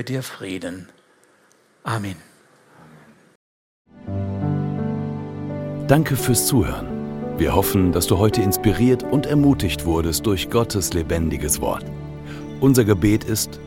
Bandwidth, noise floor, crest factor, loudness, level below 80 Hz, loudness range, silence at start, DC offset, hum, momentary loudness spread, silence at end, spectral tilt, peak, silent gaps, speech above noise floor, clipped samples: 17 kHz; -57 dBFS; 20 dB; -20 LUFS; -38 dBFS; 14 LU; 0 s; under 0.1%; none; 14 LU; 0 s; -5.5 dB/octave; 0 dBFS; 3.35-3.85 s; 38 dB; under 0.1%